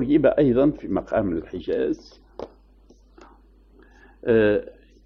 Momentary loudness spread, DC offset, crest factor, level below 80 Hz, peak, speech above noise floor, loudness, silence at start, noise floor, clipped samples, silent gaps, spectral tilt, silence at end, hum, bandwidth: 22 LU; under 0.1%; 18 dB; -46 dBFS; -6 dBFS; 32 dB; -22 LUFS; 0 s; -53 dBFS; under 0.1%; none; -9 dB/octave; 0.35 s; none; 6.4 kHz